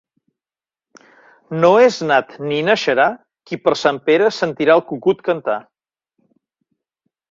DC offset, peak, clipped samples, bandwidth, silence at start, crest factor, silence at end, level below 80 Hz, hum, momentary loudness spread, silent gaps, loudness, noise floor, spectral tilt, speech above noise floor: under 0.1%; 0 dBFS; under 0.1%; 7.6 kHz; 1.5 s; 18 dB; 1.7 s; -62 dBFS; none; 10 LU; none; -16 LUFS; under -90 dBFS; -5 dB/octave; over 74 dB